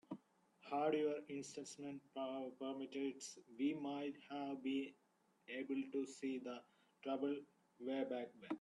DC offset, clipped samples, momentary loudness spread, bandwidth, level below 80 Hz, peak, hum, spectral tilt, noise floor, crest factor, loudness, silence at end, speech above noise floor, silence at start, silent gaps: under 0.1%; under 0.1%; 12 LU; 11.5 kHz; under -90 dBFS; -28 dBFS; none; -4.5 dB/octave; -72 dBFS; 18 dB; -46 LUFS; 0 s; 27 dB; 0.1 s; none